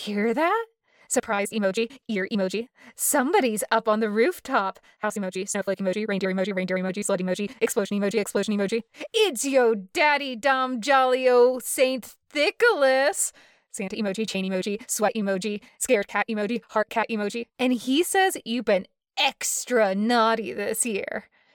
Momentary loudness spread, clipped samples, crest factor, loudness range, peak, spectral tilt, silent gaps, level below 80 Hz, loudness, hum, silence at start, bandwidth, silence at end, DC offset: 9 LU; under 0.1%; 16 dB; 5 LU; -10 dBFS; -3.5 dB/octave; none; -70 dBFS; -24 LUFS; none; 0 s; 19 kHz; 0.35 s; under 0.1%